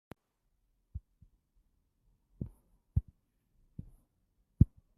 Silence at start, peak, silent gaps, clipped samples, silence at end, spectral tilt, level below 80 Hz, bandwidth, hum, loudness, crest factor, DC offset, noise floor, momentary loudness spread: 0.95 s; -8 dBFS; none; under 0.1%; 0.3 s; -11.5 dB/octave; -46 dBFS; 2.7 kHz; none; -35 LUFS; 30 dB; under 0.1%; -79 dBFS; 23 LU